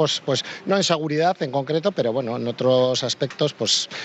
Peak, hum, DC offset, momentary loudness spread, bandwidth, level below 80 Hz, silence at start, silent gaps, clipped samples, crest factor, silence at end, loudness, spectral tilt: -6 dBFS; none; under 0.1%; 6 LU; 8.8 kHz; -70 dBFS; 0 s; none; under 0.1%; 16 dB; 0 s; -22 LUFS; -4 dB/octave